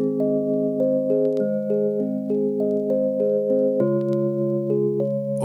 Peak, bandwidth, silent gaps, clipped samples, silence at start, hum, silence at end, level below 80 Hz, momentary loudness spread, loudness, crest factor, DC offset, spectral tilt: -8 dBFS; 11 kHz; none; under 0.1%; 0 s; none; 0 s; -70 dBFS; 3 LU; -22 LUFS; 14 dB; under 0.1%; -10.5 dB/octave